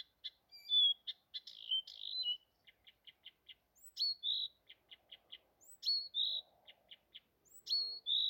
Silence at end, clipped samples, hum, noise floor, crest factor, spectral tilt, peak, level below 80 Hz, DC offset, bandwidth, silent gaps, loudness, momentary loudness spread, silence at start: 0 s; under 0.1%; none; -70 dBFS; 16 dB; 2 dB/octave; -26 dBFS; -88 dBFS; under 0.1%; 16.5 kHz; none; -36 LUFS; 25 LU; 0.25 s